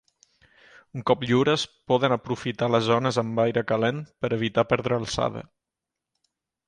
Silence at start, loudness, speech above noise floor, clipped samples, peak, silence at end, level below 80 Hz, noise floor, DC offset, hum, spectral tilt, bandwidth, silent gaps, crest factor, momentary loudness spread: 0.95 s; -24 LUFS; 63 dB; under 0.1%; -4 dBFS; 1.25 s; -56 dBFS; -87 dBFS; under 0.1%; none; -5.5 dB/octave; 10.5 kHz; none; 20 dB; 8 LU